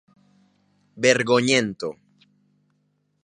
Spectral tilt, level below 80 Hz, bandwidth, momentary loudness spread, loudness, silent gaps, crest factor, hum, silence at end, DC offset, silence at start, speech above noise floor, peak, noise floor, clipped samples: -3.5 dB/octave; -66 dBFS; 11 kHz; 15 LU; -21 LUFS; none; 24 dB; none; 1.3 s; under 0.1%; 0.95 s; 49 dB; -2 dBFS; -69 dBFS; under 0.1%